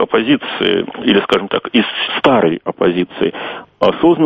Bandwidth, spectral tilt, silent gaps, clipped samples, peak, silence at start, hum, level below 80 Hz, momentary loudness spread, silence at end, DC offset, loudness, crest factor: 7.8 kHz; -6.5 dB/octave; none; under 0.1%; 0 dBFS; 0 s; none; -50 dBFS; 7 LU; 0 s; under 0.1%; -15 LUFS; 14 dB